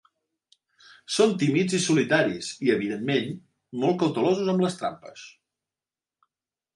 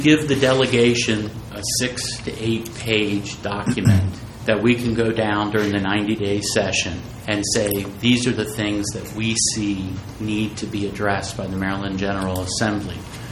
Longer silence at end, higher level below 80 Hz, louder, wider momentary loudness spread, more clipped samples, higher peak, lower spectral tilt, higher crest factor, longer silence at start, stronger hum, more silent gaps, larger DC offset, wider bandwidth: first, 1.45 s vs 0 s; second, -70 dBFS vs -44 dBFS; second, -24 LUFS vs -21 LUFS; first, 16 LU vs 10 LU; neither; second, -8 dBFS vs -2 dBFS; about the same, -5 dB/octave vs -4.5 dB/octave; about the same, 20 dB vs 20 dB; first, 1.1 s vs 0 s; neither; neither; neither; second, 11.5 kHz vs 16.5 kHz